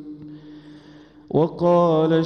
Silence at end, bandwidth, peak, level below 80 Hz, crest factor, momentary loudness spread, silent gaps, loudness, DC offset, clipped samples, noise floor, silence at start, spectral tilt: 0 s; 6.4 kHz; -8 dBFS; -62 dBFS; 14 dB; 23 LU; none; -19 LUFS; under 0.1%; under 0.1%; -47 dBFS; 0 s; -9 dB/octave